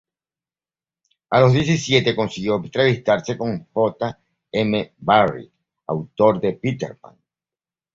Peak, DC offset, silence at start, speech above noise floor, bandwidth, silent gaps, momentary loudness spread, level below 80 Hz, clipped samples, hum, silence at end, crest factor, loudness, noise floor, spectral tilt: -2 dBFS; under 0.1%; 1.3 s; over 71 dB; 7.8 kHz; none; 12 LU; -54 dBFS; under 0.1%; none; 1 s; 20 dB; -20 LUFS; under -90 dBFS; -6 dB/octave